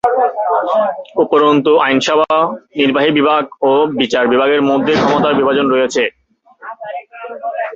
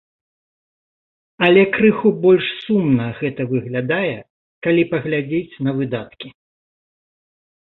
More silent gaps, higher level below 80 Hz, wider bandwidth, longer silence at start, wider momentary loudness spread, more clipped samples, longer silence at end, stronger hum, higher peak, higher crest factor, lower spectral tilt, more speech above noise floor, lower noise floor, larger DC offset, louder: second, none vs 4.30-4.62 s; about the same, -54 dBFS vs -58 dBFS; first, 7.8 kHz vs 4.2 kHz; second, 0.05 s vs 1.4 s; about the same, 14 LU vs 12 LU; neither; second, 0 s vs 1.45 s; neither; about the same, 0 dBFS vs 0 dBFS; second, 12 dB vs 18 dB; second, -5 dB/octave vs -10 dB/octave; second, 26 dB vs over 73 dB; second, -38 dBFS vs under -90 dBFS; neither; first, -13 LUFS vs -18 LUFS